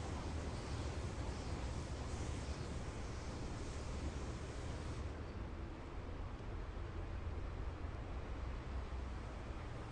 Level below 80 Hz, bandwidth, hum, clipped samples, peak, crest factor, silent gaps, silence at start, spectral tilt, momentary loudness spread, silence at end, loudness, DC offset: -48 dBFS; 11 kHz; none; under 0.1%; -32 dBFS; 14 dB; none; 0 s; -6 dB/octave; 4 LU; 0 s; -47 LUFS; under 0.1%